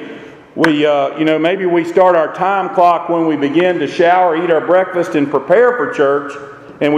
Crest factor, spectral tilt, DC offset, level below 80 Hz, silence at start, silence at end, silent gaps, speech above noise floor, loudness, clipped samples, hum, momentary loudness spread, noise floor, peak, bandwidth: 14 dB; -6.5 dB/octave; under 0.1%; -60 dBFS; 0 s; 0 s; none; 20 dB; -13 LUFS; under 0.1%; none; 8 LU; -33 dBFS; 0 dBFS; 11 kHz